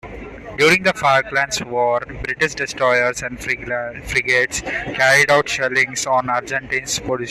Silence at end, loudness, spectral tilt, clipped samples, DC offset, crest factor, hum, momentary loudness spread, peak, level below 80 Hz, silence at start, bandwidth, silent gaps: 0 s; -17 LUFS; -3 dB/octave; under 0.1%; under 0.1%; 16 dB; none; 10 LU; -2 dBFS; -44 dBFS; 0.05 s; 14 kHz; none